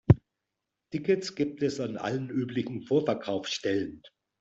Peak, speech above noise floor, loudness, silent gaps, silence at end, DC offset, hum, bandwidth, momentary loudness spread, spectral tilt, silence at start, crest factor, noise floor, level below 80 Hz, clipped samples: -4 dBFS; 55 dB; -30 LUFS; none; 0.3 s; under 0.1%; none; 8 kHz; 7 LU; -6.5 dB/octave; 0.1 s; 24 dB; -85 dBFS; -52 dBFS; under 0.1%